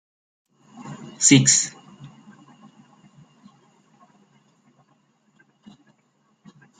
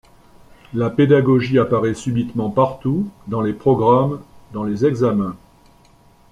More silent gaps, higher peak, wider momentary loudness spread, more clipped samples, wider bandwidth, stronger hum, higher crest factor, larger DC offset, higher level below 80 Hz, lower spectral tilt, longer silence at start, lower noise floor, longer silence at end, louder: neither; about the same, -2 dBFS vs -2 dBFS; first, 27 LU vs 11 LU; neither; about the same, 9.6 kHz vs 10.5 kHz; neither; first, 26 dB vs 16 dB; neither; second, -66 dBFS vs -50 dBFS; second, -3 dB/octave vs -8 dB/octave; about the same, 0.8 s vs 0.7 s; first, -66 dBFS vs -51 dBFS; first, 4.75 s vs 0.95 s; about the same, -16 LUFS vs -18 LUFS